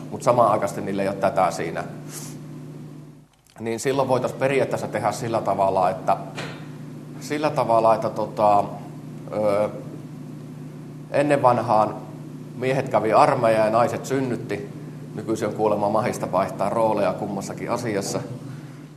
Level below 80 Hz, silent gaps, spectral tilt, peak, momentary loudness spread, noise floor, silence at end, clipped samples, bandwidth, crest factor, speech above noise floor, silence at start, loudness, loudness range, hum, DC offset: -62 dBFS; none; -6 dB/octave; -2 dBFS; 19 LU; -49 dBFS; 0 s; under 0.1%; 13 kHz; 22 dB; 27 dB; 0 s; -22 LUFS; 5 LU; none; under 0.1%